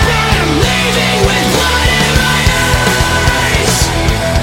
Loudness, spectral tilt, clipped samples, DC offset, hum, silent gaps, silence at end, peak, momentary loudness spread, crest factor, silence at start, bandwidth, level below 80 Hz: -10 LUFS; -3.5 dB/octave; under 0.1%; under 0.1%; none; none; 0 s; 0 dBFS; 1 LU; 10 dB; 0 s; 17 kHz; -18 dBFS